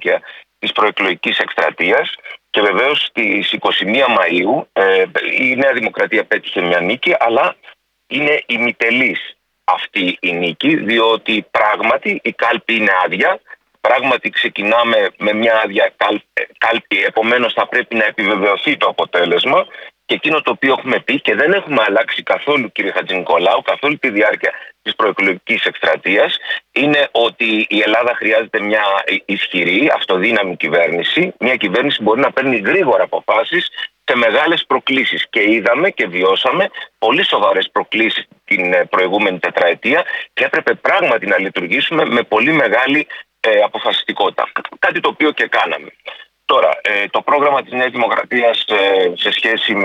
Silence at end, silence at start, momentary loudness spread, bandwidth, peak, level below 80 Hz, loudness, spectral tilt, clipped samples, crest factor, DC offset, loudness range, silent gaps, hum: 0 s; 0 s; 5 LU; 9.6 kHz; -2 dBFS; -66 dBFS; -14 LUFS; -5 dB/octave; under 0.1%; 14 dB; under 0.1%; 1 LU; none; none